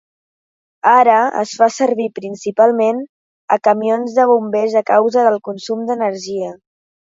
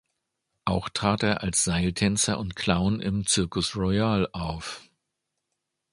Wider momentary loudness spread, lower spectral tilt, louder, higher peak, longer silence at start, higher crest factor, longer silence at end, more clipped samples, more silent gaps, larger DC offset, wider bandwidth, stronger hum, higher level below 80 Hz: first, 12 LU vs 9 LU; about the same, -4.5 dB/octave vs -4 dB/octave; first, -15 LUFS vs -26 LUFS; first, 0 dBFS vs -4 dBFS; first, 0.85 s vs 0.65 s; second, 16 dB vs 24 dB; second, 0.45 s vs 1.1 s; neither; first, 3.09-3.48 s vs none; neither; second, 7.8 kHz vs 11.5 kHz; neither; second, -68 dBFS vs -44 dBFS